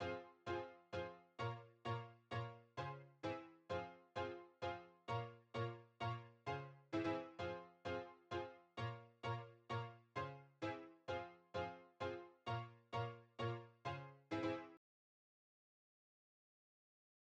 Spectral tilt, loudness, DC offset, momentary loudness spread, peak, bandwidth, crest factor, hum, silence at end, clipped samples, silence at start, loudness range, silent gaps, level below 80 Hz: -6.5 dB/octave; -49 LUFS; under 0.1%; 5 LU; -32 dBFS; 8.4 kHz; 18 dB; none; 2.6 s; under 0.1%; 0 s; 2 LU; none; -78 dBFS